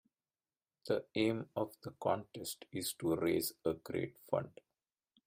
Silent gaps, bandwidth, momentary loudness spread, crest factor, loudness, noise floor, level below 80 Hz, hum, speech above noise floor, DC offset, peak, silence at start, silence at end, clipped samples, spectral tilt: none; 16 kHz; 9 LU; 20 dB; -38 LUFS; under -90 dBFS; -72 dBFS; none; over 52 dB; under 0.1%; -18 dBFS; 0.85 s; 0.75 s; under 0.1%; -5 dB/octave